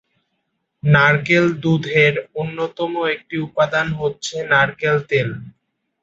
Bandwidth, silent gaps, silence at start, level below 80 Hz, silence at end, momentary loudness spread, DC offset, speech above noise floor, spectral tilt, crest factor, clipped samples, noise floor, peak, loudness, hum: 8 kHz; none; 0.85 s; -52 dBFS; 0.55 s; 11 LU; under 0.1%; 55 dB; -6 dB/octave; 18 dB; under 0.1%; -72 dBFS; -2 dBFS; -18 LUFS; none